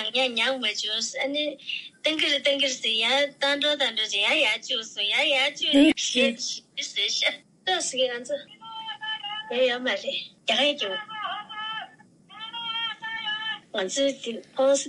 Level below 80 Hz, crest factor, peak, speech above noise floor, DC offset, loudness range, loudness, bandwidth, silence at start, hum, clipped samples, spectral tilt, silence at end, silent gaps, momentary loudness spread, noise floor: -70 dBFS; 18 dB; -8 dBFS; 27 dB; under 0.1%; 7 LU; -25 LUFS; 11.5 kHz; 0 s; none; under 0.1%; -1 dB/octave; 0 s; none; 12 LU; -52 dBFS